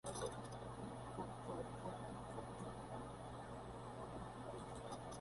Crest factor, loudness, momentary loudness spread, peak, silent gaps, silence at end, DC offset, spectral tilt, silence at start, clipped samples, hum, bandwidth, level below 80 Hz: 18 dB; -51 LUFS; 4 LU; -32 dBFS; none; 0 s; under 0.1%; -5.5 dB/octave; 0.05 s; under 0.1%; none; 11.5 kHz; -64 dBFS